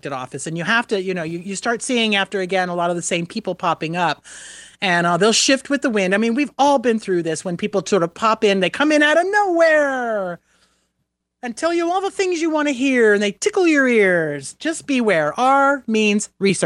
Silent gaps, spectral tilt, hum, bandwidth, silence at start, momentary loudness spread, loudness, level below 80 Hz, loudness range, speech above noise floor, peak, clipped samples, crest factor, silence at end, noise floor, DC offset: none; -4 dB/octave; none; 12 kHz; 0.05 s; 11 LU; -18 LUFS; -64 dBFS; 4 LU; 56 dB; -4 dBFS; under 0.1%; 16 dB; 0 s; -74 dBFS; under 0.1%